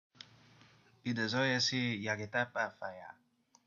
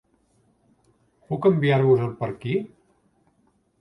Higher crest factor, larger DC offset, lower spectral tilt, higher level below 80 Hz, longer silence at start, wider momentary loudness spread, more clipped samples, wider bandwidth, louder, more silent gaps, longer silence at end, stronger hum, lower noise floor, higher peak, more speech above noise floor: about the same, 20 dB vs 18 dB; neither; second, -4 dB/octave vs -9.5 dB/octave; second, -80 dBFS vs -62 dBFS; second, 1.05 s vs 1.3 s; first, 24 LU vs 12 LU; neither; first, 7.6 kHz vs 5.6 kHz; second, -35 LUFS vs -22 LUFS; neither; second, 0.55 s vs 1.15 s; neither; about the same, -64 dBFS vs -66 dBFS; second, -18 dBFS vs -6 dBFS; second, 29 dB vs 44 dB